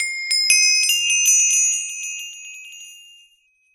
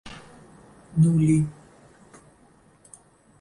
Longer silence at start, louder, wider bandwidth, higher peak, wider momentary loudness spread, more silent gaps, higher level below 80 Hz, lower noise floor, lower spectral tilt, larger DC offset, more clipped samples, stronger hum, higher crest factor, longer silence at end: about the same, 0 s vs 0.05 s; first, -15 LUFS vs -22 LUFS; first, 17 kHz vs 11 kHz; first, 0 dBFS vs -10 dBFS; about the same, 22 LU vs 24 LU; neither; second, -78 dBFS vs -54 dBFS; about the same, -59 dBFS vs -57 dBFS; second, 8 dB/octave vs -8 dB/octave; neither; neither; neither; about the same, 20 dB vs 18 dB; second, 0.8 s vs 1.9 s